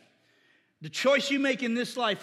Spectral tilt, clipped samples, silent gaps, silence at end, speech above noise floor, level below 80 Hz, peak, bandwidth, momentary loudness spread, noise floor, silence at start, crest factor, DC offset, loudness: -3.5 dB/octave; under 0.1%; none; 0 s; 39 dB; -90 dBFS; -12 dBFS; 13.5 kHz; 11 LU; -66 dBFS; 0.8 s; 18 dB; under 0.1%; -27 LUFS